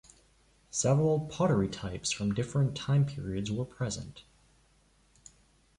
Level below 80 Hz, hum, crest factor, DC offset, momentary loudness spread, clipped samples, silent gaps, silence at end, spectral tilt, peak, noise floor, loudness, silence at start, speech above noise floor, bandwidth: -56 dBFS; none; 16 dB; under 0.1%; 9 LU; under 0.1%; none; 1.6 s; -5.5 dB/octave; -16 dBFS; -66 dBFS; -31 LUFS; 0.75 s; 36 dB; 11 kHz